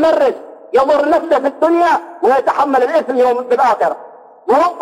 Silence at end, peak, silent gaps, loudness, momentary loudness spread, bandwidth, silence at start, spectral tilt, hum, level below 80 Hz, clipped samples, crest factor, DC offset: 0 s; -2 dBFS; none; -14 LUFS; 5 LU; 16 kHz; 0 s; -4.5 dB/octave; none; -56 dBFS; under 0.1%; 10 dB; under 0.1%